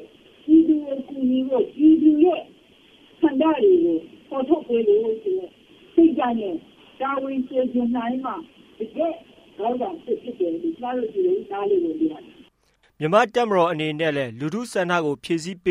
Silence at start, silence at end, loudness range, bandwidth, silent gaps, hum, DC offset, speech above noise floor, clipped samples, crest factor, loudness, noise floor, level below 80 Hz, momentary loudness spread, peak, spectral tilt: 0 s; 0 s; 7 LU; 11 kHz; none; none; under 0.1%; 42 dB; under 0.1%; 18 dB; -22 LUFS; -63 dBFS; -62 dBFS; 12 LU; -4 dBFS; -6.5 dB/octave